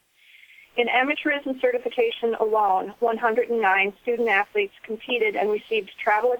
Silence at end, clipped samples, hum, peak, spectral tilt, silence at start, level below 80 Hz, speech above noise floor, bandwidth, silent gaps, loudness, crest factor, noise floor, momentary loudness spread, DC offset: 0 s; under 0.1%; none; -6 dBFS; -5 dB/octave; 0.75 s; -68 dBFS; 31 dB; 19 kHz; none; -23 LUFS; 16 dB; -54 dBFS; 6 LU; under 0.1%